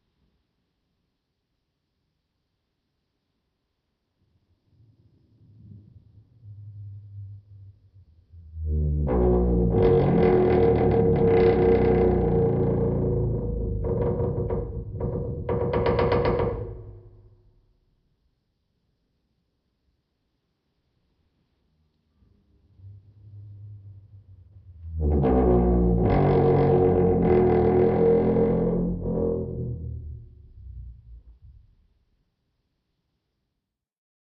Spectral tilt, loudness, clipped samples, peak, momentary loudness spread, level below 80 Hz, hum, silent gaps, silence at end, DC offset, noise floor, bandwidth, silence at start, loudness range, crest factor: -12 dB/octave; -22 LUFS; under 0.1%; -8 dBFS; 23 LU; -36 dBFS; none; none; 2.9 s; under 0.1%; -83 dBFS; 5.4 kHz; 5.7 s; 13 LU; 18 dB